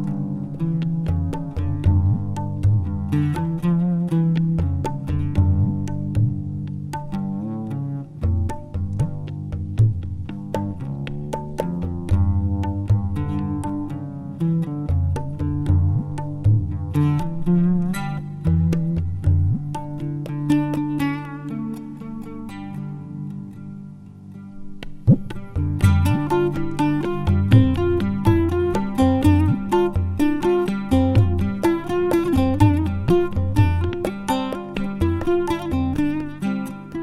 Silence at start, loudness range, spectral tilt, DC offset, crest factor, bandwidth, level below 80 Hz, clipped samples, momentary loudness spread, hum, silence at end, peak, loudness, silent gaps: 0 s; 7 LU; -8.5 dB/octave; under 0.1%; 20 dB; 12.5 kHz; -34 dBFS; under 0.1%; 12 LU; none; 0 s; -2 dBFS; -22 LUFS; none